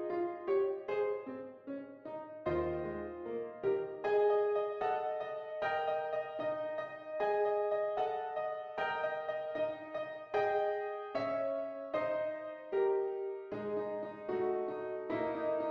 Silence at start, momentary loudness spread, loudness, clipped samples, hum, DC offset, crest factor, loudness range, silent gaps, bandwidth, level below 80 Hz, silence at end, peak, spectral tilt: 0 s; 9 LU; -37 LUFS; under 0.1%; none; under 0.1%; 14 dB; 2 LU; none; 6 kHz; -66 dBFS; 0 s; -22 dBFS; -7.5 dB/octave